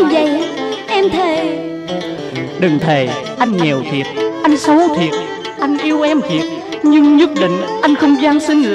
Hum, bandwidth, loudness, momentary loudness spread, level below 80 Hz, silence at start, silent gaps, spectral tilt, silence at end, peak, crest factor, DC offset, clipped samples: none; 10 kHz; -14 LUFS; 11 LU; -52 dBFS; 0 s; none; -5.5 dB/octave; 0 s; 0 dBFS; 12 dB; under 0.1%; under 0.1%